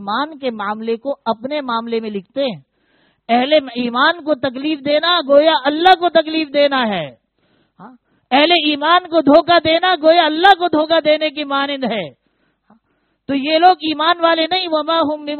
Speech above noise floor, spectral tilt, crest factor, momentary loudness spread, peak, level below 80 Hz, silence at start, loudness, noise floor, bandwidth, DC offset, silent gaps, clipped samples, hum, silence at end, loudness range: 50 dB; -0.5 dB/octave; 16 dB; 11 LU; 0 dBFS; -58 dBFS; 0 s; -15 LUFS; -65 dBFS; 4.6 kHz; under 0.1%; none; under 0.1%; none; 0 s; 6 LU